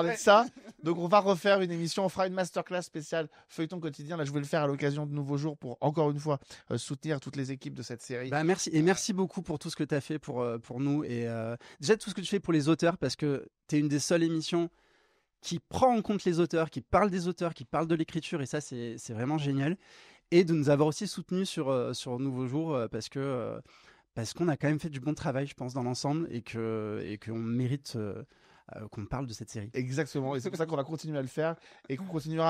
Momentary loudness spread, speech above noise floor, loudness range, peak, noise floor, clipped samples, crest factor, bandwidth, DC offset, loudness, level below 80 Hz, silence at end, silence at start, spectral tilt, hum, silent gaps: 12 LU; 39 dB; 5 LU; -8 dBFS; -70 dBFS; under 0.1%; 22 dB; 15 kHz; under 0.1%; -31 LUFS; -62 dBFS; 0 s; 0 s; -5.5 dB/octave; none; none